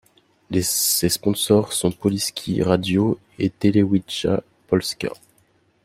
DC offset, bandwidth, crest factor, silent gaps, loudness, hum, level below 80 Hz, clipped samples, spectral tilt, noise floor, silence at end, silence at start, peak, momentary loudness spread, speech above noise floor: under 0.1%; 16 kHz; 18 dB; none; -21 LUFS; none; -52 dBFS; under 0.1%; -4.5 dB/octave; -61 dBFS; 0.7 s; 0.5 s; -2 dBFS; 8 LU; 41 dB